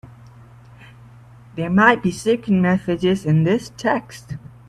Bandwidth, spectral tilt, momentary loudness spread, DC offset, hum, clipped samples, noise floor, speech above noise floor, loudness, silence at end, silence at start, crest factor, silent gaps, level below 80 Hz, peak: 12.5 kHz; -6.5 dB/octave; 20 LU; under 0.1%; none; under 0.1%; -44 dBFS; 26 dB; -18 LUFS; 0.2 s; 0.05 s; 20 dB; none; -52 dBFS; 0 dBFS